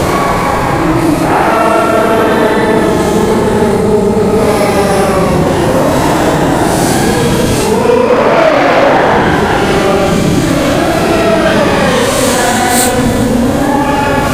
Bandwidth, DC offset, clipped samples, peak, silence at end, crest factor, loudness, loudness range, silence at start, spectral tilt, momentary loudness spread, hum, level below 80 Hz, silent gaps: 17 kHz; under 0.1%; 0.2%; 0 dBFS; 0 s; 10 dB; -9 LUFS; 1 LU; 0 s; -5 dB/octave; 3 LU; none; -26 dBFS; none